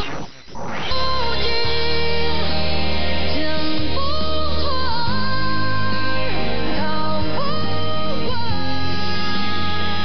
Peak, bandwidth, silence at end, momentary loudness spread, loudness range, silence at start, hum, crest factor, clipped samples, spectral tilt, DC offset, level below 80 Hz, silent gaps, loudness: -8 dBFS; 6.4 kHz; 0 s; 3 LU; 2 LU; 0 s; none; 10 dB; under 0.1%; -6 dB/octave; 20%; -36 dBFS; none; -22 LUFS